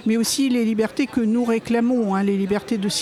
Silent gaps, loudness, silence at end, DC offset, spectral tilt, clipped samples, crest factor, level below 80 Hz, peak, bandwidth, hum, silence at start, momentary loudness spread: none; -21 LUFS; 0 s; under 0.1%; -4.5 dB/octave; under 0.1%; 12 dB; -56 dBFS; -8 dBFS; 15.5 kHz; none; 0 s; 3 LU